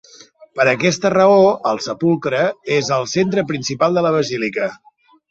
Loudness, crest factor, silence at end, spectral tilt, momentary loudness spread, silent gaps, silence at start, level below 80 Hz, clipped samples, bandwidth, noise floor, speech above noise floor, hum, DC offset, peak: -17 LUFS; 16 dB; 0.55 s; -5 dB/octave; 9 LU; none; 0.55 s; -58 dBFS; under 0.1%; 8 kHz; -45 dBFS; 29 dB; none; under 0.1%; -2 dBFS